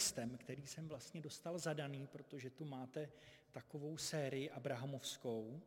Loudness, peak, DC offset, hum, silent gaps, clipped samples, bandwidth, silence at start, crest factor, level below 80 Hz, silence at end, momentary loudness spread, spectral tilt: -47 LUFS; -28 dBFS; under 0.1%; none; none; under 0.1%; 16.5 kHz; 0 s; 20 dB; -80 dBFS; 0 s; 10 LU; -4 dB/octave